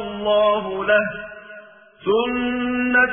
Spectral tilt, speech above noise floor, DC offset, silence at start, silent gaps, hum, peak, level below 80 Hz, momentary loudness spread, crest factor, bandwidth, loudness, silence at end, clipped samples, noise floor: -8.5 dB/octave; 24 dB; under 0.1%; 0 s; none; none; -4 dBFS; -50 dBFS; 17 LU; 16 dB; 3.6 kHz; -20 LUFS; 0 s; under 0.1%; -43 dBFS